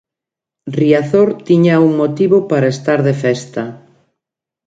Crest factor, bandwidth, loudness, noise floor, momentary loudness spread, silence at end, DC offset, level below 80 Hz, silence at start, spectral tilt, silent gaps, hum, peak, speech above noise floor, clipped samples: 14 dB; 9 kHz; -13 LUFS; -85 dBFS; 13 LU; 0.9 s; under 0.1%; -58 dBFS; 0.65 s; -7.5 dB/octave; none; none; 0 dBFS; 72 dB; under 0.1%